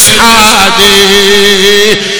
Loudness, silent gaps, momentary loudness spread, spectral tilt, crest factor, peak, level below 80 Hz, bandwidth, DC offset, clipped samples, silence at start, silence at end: -3 LUFS; none; 2 LU; -1.5 dB/octave; 4 dB; 0 dBFS; -28 dBFS; over 20 kHz; under 0.1%; 9%; 0 s; 0 s